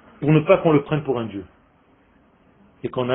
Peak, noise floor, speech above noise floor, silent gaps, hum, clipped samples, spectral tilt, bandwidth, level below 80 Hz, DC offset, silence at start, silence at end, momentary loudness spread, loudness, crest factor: 0 dBFS; -57 dBFS; 38 dB; none; none; under 0.1%; -12.5 dB/octave; 3.8 kHz; -54 dBFS; under 0.1%; 0.2 s; 0 s; 17 LU; -20 LUFS; 22 dB